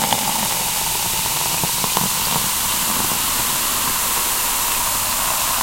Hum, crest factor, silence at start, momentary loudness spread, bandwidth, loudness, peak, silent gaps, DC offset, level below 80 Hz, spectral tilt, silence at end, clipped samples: none; 20 dB; 0 s; 1 LU; 16.5 kHz; -17 LUFS; 0 dBFS; none; under 0.1%; -40 dBFS; -0.5 dB/octave; 0 s; under 0.1%